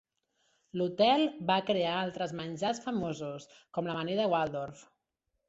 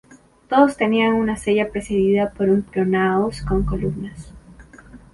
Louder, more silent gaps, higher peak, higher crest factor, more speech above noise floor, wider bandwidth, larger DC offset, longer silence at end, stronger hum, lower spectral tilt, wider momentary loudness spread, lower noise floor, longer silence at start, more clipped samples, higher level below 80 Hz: second, -32 LUFS vs -19 LUFS; neither; second, -14 dBFS vs -2 dBFS; about the same, 20 dB vs 18 dB; first, 52 dB vs 25 dB; second, 8 kHz vs 11.5 kHz; neither; first, 0.65 s vs 0.15 s; neither; second, -5.5 dB/octave vs -7 dB/octave; first, 13 LU vs 8 LU; first, -83 dBFS vs -44 dBFS; first, 0.75 s vs 0.5 s; neither; second, -70 dBFS vs -36 dBFS